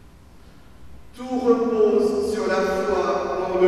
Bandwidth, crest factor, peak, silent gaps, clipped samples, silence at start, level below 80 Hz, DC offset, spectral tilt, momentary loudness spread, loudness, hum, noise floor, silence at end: 13 kHz; 16 dB; -6 dBFS; none; under 0.1%; 0.8 s; -48 dBFS; under 0.1%; -5.5 dB/octave; 6 LU; -21 LUFS; none; -48 dBFS; 0 s